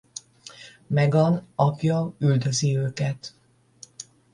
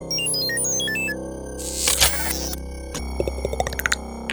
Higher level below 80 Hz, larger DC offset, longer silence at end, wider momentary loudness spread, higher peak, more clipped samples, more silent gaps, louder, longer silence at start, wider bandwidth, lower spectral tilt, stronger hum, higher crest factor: second, -60 dBFS vs -34 dBFS; neither; first, 0.3 s vs 0 s; first, 22 LU vs 14 LU; second, -6 dBFS vs 0 dBFS; neither; neither; about the same, -23 LUFS vs -22 LUFS; first, 0.45 s vs 0 s; second, 11 kHz vs over 20 kHz; first, -6 dB/octave vs -1.5 dB/octave; neither; second, 18 dB vs 24 dB